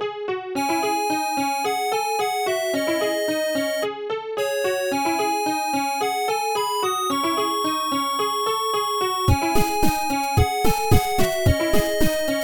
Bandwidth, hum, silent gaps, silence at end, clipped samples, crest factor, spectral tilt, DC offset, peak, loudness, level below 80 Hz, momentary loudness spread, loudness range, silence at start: 19.5 kHz; none; none; 0 s; under 0.1%; 18 dB; -4 dB/octave; under 0.1%; -4 dBFS; -22 LUFS; -36 dBFS; 3 LU; 2 LU; 0 s